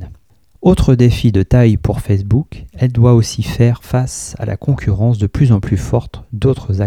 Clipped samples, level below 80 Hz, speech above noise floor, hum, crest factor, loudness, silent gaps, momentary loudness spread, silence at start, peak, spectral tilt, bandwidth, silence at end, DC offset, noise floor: under 0.1%; -28 dBFS; 35 dB; none; 12 dB; -14 LUFS; none; 8 LU; 0 s; 0 dBFS; -7.5 dB/octave; 13.5 kHz; 0 s; 0.2%; -47 dBFS